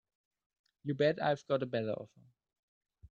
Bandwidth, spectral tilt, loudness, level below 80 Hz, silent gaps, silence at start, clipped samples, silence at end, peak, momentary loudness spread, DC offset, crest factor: 7.4 kHz; -7 dB/octave; -34 LUFS; -74 dBFS; 2.59-2.81 s; 0.85 s; under 0.1%; 0.05 s; -18 dBFS; 14 LU; under 0.1%; 20 dB